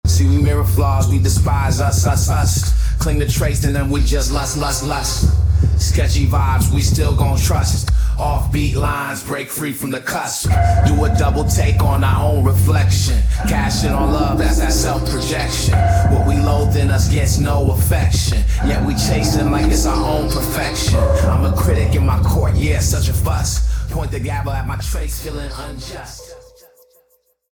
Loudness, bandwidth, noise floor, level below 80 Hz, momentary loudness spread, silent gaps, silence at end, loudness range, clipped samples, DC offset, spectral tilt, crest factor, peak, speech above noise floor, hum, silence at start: -16 LUFS; over 20 kHz; -60 dBFS; -20 dBFS; 8 LU; none; 1.15 s; 4 LU; under 0.1%; under 0.1%; -5 dB/octave; 14 dB; -2 dBFS; 45 dB; none; 0.05 s